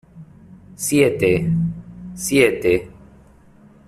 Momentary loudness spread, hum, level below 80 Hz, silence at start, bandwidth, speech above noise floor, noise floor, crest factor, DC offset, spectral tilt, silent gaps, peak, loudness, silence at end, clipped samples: 11 LU; none; -46 dBFS; 0.15 s; 14.5 kHz; 31 dB; -48 dBFS; 18 dB; under 0.1%; -5 dB/octave; none; -2 dBFS; -18 LUFS; 0.95 s; under 0.1%